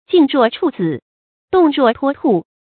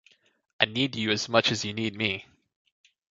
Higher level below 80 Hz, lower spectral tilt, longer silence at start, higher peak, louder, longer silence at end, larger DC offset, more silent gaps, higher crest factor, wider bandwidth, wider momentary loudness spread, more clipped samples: first, -56 dBFS vs -62 dBFS; first, -11.5 dB/octave vs -3.5 dB/octave; second, 0.1 s vs 0.6 s; about the same, 0 dBFS vs -2 dBFS; first, -15 LUFS vs -26 LUFS; second, 0.2 s vs 0.9 s; neither; first, 1.02-1.48 s vs none; second, 14 dB vs 28 dB; second, 4.6 kHz vs 7.8 kHz; first, 9 LU vs 6 LU; neither